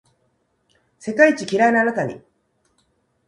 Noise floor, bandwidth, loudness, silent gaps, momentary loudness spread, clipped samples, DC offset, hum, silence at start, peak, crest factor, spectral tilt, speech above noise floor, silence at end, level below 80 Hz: -67 dBFS; 11 kHz; -18 LUFS; none; 16 LU; under 0.1%; under 0.1%; none; 1.05 s; -2 dBFS; 20 dB; -5 dB/octave; 50 dB; 1.1 s; -66 dBFS